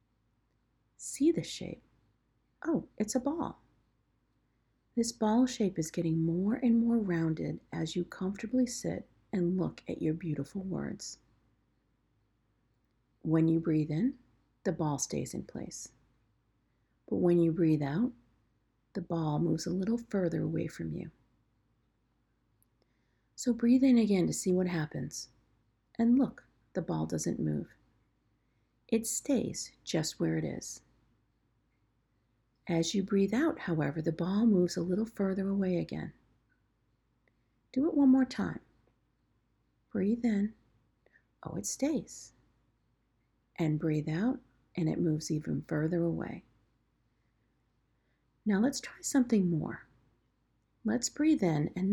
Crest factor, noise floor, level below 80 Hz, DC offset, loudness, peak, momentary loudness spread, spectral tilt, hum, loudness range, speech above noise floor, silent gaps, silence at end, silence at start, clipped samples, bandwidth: 16 dB; -75 dBFS; -64 dBFS; under 0.1%; -32 LUFS; -16 dBFS; 14 LU; -6 dB/octave; none; 7 LU; 44 dB; none; 0 s; 1 s; under 0.1%; 17 kHz